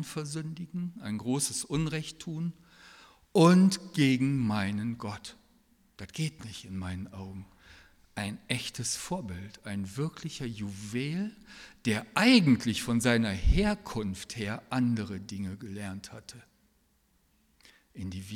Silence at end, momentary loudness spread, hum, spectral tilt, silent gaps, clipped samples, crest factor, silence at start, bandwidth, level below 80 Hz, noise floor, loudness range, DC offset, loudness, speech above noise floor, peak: 0 s; 19 LU; none; -5 dB/octave; none; under 0.1%; 22 dB; 0 s; 16 kHz; -44 dBFS; -69 dBFS; 11 LU; under 0.1%; -30 LUFS; 40 dB; -8 dBFS